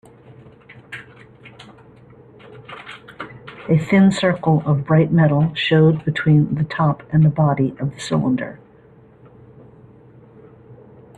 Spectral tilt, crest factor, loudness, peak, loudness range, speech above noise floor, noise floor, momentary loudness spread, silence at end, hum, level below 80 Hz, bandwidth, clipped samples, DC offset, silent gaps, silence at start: -7.5 dB/octave; 16 dB; -17 LUFS; -4 dBFS; 12 LU; 32 dB; -48 dBFS; 21 LU; 0.45 s; none; -52 dBFS; 9.4 kHz; under 0.1%; under 0.1%; none; 0.9 s